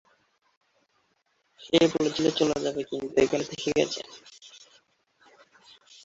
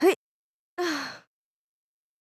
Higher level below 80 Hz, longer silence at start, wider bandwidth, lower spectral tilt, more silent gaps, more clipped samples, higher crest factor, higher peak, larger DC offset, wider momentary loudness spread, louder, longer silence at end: first, -62 dBFS vs -82 dBFS; first, 1.6 s vs 0 s; second, 8 kHz vs 14.5 kHz; first, -4.5 dB/octave vs -2.5 dB/octave; second, none vs 0.16-0.77 s; neither; about the same, 22 dB vs 20 dB; about the same, -8 dBFS vs -10 dBFS; neither; first, 24 LU vs 16 LU; first, -26 LUFS vs -30 LUFS; first, 1.45 s vs 1.05 s